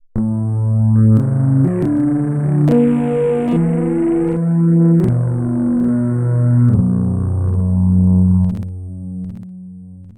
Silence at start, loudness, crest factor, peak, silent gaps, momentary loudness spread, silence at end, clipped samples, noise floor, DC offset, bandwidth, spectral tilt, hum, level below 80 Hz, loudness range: 0.15 s; -15 LUFS; 10 dB; -4 dBFS; none; 15 LU; 0.05 s; under 0.1%; -35 dBFS; under 0.1%; 9.8 kHz; -11 dB/octave; none; -38 dBFS; 1 LU